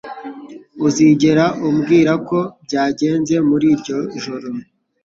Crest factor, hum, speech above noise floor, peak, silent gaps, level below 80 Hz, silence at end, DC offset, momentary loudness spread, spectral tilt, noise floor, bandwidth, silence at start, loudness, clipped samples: 14 dB; none; 20 dB; -2 dBFS; none; -54 dBFS; 0.4 s; under 0.1%; 18 LU; -6 dB/octave; -35 dBFS; 7.6 kHz; 0.05 s; -16 LUFS; under 0.1%